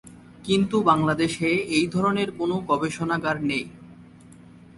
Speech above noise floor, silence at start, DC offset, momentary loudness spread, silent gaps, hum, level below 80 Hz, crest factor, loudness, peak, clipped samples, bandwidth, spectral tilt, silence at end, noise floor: 25 dB; 0.05 s; under 0.1%; 7 LU; none; none; -56 dBFS; 20 dB; -23 LUFS; -4 dBFS; under 0.1%; 11.5 kHz; -5.5 dB/octave; 0.45 s; -48 dBFS